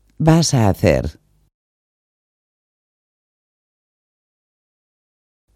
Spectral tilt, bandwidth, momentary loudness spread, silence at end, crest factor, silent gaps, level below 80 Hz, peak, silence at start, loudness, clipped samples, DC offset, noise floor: -6 dB/octave; 15.5 kHz; 7 LU; 4.45 s; 22 dB; none; -40 dBFS; 0 dBFS; 0.2 s; -15 LUFS; under 0.1%; under 0.1%; under -90 dBFS